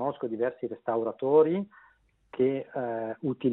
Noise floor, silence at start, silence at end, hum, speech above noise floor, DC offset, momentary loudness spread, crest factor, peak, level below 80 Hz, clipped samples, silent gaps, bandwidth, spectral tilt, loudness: -54 dBFS; 0 s; 0 s; none; 26 dB; under 0.1%; 11 LU; 18 dB; -10 dBFS; -72 dBFS; under 0.1%; none; 4 kHz; -11 dB/octave; -29 LUFS